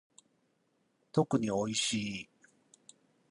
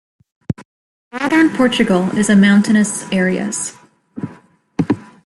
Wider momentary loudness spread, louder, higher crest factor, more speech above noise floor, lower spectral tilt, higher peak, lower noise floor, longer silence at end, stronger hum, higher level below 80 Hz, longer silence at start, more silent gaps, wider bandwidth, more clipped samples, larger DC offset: second, 11 LU vs 19 LU; second, -33 LUFS vs -15 LUFS; first, 22 dB vs 14 dB; first, 43 dB vs 31 dB; about the same, -4 dB/octave vs -5 dB/octave; second, -14 dBFS vs -2 dBFS; first, -75 dBFS vs -45 dBFS; first, 1.1 s vs 0.2 s; neither; second, -70 dBFS vs -52 dBFS; first, 1.15 s vs 0.5 s; second, none vs 0.65-1.11 s; about the same, 11 kHz vs 12 kHz; neither; neither